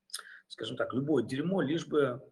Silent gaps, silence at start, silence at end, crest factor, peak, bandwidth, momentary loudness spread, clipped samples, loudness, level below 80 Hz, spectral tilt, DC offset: none; 0.15 s; 0.05 s; 18 dB; -16 dBFS; 12.5 kHz; 13 LU; under 0.1%; -32 LUFS; -74 dBFS; -6 dB/octave; under 0.1%